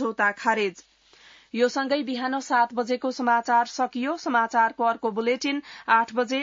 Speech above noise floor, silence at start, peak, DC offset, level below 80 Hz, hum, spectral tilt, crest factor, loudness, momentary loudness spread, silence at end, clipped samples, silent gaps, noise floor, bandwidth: 29 dB; 0 s; -8 dBFS; under 0.1%; -74 dBFS; none; -3.5 dB/octave; 18 dB; -24 LUFS; 6 LU; 0 s; under 0.1%; none; -54 dBFS; 7.8 kHz